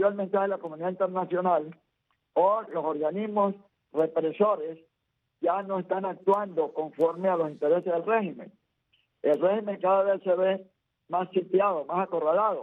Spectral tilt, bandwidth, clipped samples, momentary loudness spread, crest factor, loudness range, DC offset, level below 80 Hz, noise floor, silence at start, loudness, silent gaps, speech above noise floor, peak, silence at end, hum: -9 dB/octave; 4 kHz; under 0.1%; 7 LU; 16 dB; 2 LU; under 0.1%; -78 dBFS; -79 dBFS; 0 s; -27 LUFS; none; 53 dB; -12 dBFS; 0 s; none